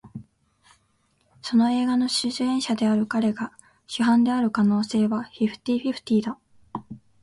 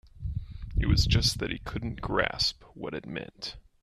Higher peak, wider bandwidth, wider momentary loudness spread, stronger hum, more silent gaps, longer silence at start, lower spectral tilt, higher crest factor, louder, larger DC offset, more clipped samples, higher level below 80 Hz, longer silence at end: about the same, -10 dBFS vs -10 dBFS; second, 11.5 kHz vs 13.5 kHz; about the same, 17 LU vs 15 LU; neither; neither; about the same, 0.05 s vs 0.05 s; about the same, -5 dB/octave vs -4.5 dB/octave; second, 14 dB vs 20 dB; first, -23 LUFS vs -30 LUFS; neither; neither; second, -62 dBFS vs -36 dBFS; about the same, 0.25 s vs 0.25 s